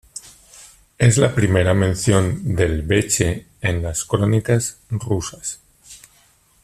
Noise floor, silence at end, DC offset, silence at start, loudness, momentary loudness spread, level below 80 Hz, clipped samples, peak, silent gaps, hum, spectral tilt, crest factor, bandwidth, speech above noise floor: -56 dBFS; 0.65 s; under 0.1%; 0.15 s; -19 LUFS; 12 LU; -40 dBFS; under 0.1%; -2 dBFS; none; none; -5 dB/octave; 18 dB; 14 kHz; 38 dB